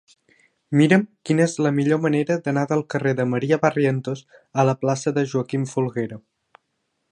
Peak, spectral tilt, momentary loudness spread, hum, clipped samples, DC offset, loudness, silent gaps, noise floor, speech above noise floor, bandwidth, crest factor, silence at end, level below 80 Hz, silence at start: -2 dBFS; -6.5 dB/octave; 9 LU; none; under 0.1%; under 0.1%; -21 LUFS; none; -74 dBFS; 53 dB; 10.5 kHz; 20 dB; 0.95 s; -68 dBFS; 0.7 s